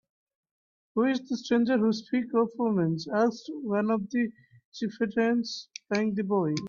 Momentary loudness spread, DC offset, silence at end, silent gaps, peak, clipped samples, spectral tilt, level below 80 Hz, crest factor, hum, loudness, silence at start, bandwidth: 9 LU; under 0.1%; 0 s; 4.65-4.72 s; -14 dBFS; under 0.1%; -6.5 dB/octave; -72 dBFS; 14 dB; none; -28 LUFS; 0.95 s; 7.2 kHz